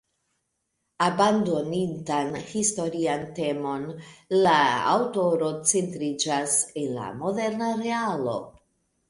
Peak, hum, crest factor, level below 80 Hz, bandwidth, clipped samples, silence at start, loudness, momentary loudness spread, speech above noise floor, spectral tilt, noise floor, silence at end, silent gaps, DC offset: -6 dBFS; none; 20 dB; -66 dBFS; 11.5 kHz; under 0.1%; 1 s; -25 LUFS; 10 LU; 53 dB; -3.5 dB/octave; -78 dBFS; 0.6 s; none; under 0.1%